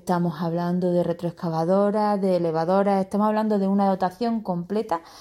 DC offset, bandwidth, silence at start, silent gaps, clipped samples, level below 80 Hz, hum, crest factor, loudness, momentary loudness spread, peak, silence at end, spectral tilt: under 0.1%; 13.5 kHz; 0.05 s; none; under 0.1%; -64 dBFS; none; 14 dB; -23 LUFS; 6 LU; -10 dBFS; 0 s; -8.5 dB/octave